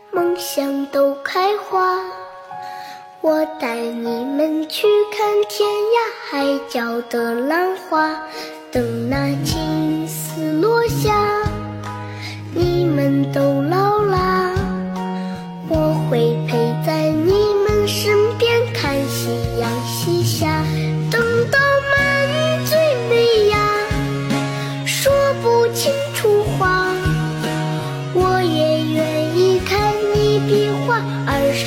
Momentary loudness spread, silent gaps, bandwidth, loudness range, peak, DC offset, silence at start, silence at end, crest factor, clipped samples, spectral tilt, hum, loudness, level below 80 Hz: 8 LU; none; 16.5 kHz; 4 LU; -4 dBFS; under 0.1%; 0.1 s; 0 s; 14 dB; under 0.1%; -5.5 dB/octave; none; -18 LUFS; -38 dBFS